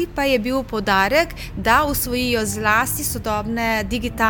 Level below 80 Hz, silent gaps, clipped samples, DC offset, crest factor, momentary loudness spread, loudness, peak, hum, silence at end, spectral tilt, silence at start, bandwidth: -36 dBFS; none; under 0.1%; under 0.1%; 18 dB; 7 LU; -19 LUFS; -2 dBFS; none; 0 s; -3.5 dB/octave; 0 s; 19.5 kHz